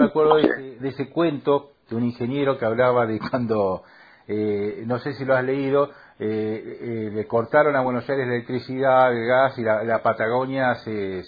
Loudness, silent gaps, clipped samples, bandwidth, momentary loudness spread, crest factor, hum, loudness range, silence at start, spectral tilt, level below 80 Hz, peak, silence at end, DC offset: -22 LUFS; none; under 0.1%; 5 kHz; 10 LU; 20 dB; none; 4 LU; 0 s; -9.5 dB/octave; -62 dBFS; -2 dBFS; 0 s; under 0.1%